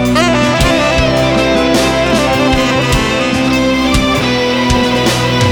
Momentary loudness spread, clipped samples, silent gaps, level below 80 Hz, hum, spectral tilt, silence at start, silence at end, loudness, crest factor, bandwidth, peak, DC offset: 1 LU; under 0.1%; none; -24 dBFS; none; -4.5 dB/octave; 0 s; 0 s; -11 LUFS; 10 dB; over 20 kHz; 0 dBFS; under 0.1%